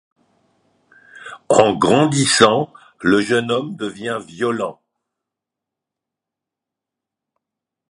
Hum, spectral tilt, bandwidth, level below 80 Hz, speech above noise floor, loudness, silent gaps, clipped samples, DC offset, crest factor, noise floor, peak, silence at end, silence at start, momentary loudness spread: none; -4 dB/octave; 11.5 kHz; -56 dBFS; 68 dB; -17 LUFS; none; under 0.1%; under 0.1%; 20 dB; -85 dBFS; 0 dBFS; 3.2 s; 1.15 s; 15 LU